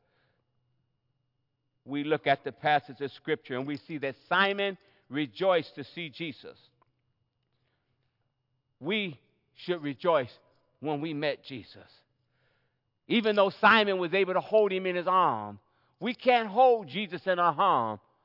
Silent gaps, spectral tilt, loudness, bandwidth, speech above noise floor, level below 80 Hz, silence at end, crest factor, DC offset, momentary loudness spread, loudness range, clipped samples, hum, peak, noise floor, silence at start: none; -7.5 dB/octave; -28 LUFS; 5.8 kHz; 50 dB; -82 dBFS; 0.25 s; 22 dB; under 0.1%; 16 LU; 11 LU; under 0.1%; none; -8 dBFS; -78 dBFS; 1.85 s